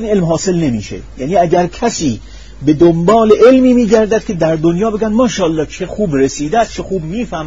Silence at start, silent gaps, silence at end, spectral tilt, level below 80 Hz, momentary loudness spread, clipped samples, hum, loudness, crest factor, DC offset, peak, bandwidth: 0 s; none; 0 s; -6 dB/octave; -34 dBFS; 12 LU; 0.2%; none; -12 LUFS; 12 dB; 1%; 0 dBFS; 7.8 kHz